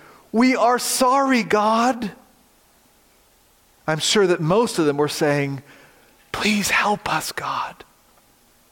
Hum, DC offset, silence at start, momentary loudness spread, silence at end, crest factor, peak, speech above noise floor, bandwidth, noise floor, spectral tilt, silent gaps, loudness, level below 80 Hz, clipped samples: none; under 0.1%; 0.35 s; 11 LU; 1 s; 16 dB; -6 dBFS; 37 dB; 17 kHz; -57 dBFS; -4 dB/octave; none; -19 LUFS; -56 dBFS; under 0.1%